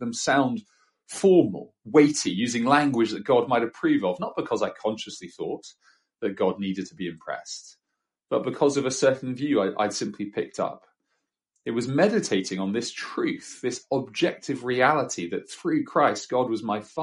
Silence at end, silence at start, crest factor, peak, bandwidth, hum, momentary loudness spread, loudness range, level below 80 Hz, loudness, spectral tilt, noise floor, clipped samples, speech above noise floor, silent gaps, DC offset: 0 s; 0 s; 20 dB; -4 dBFS; 11.5 kHz; none; 13 LU; 8 LU; -70 dBFS; -25 LUFS; -4.5 dB/octave; -83 dBFS; under 0.1%; 58 dB; none; under 0.1%